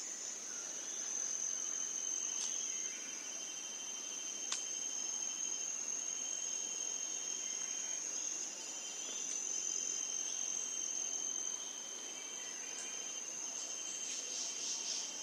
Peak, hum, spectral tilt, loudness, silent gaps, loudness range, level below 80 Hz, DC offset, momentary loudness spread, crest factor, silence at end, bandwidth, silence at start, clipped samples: -18 dBFS; none; 2 dB/octave; -38 LUFS; none; 2 LU; under -90 dBFS; under 0.1%; 5 LU; 24 dB; 0 s; 16 kHz; 0 s; under 0.1%